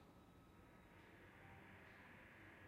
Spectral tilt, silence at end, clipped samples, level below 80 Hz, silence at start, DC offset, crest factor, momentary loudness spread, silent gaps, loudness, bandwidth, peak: -5.5 dB/octave; 0 s; under 0.1%; -76 dBFS; 0 s; under 0.1%; 14 dB; 5 LU; none; -64 LUFS; 15.5 kHz; -50 dBFS